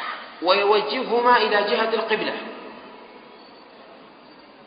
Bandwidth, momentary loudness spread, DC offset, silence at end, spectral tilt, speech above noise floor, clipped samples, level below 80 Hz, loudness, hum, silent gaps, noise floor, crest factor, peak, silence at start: 5.2 kHz; 21 LU; under 0.1%; 0.65 s; -7.5 dB/octave; 27 dB; under 0.1%; -72 dBFS; -21 LUFS; none; none; -47 dBFS; 20 dB; -4 dBFS; 0 s